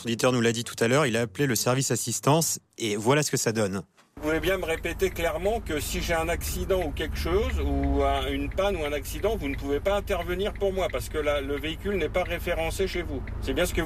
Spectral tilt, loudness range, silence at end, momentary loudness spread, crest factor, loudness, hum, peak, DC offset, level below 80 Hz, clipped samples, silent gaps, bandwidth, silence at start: -4.5 dB/octave; 4 LU; 0 s; 7 LU; 16 dB; -27 LUFS; none; -10 dBFS; under 0.1%; -36 dBFS; under 0.1%; none; 15.5 kHz; 0 s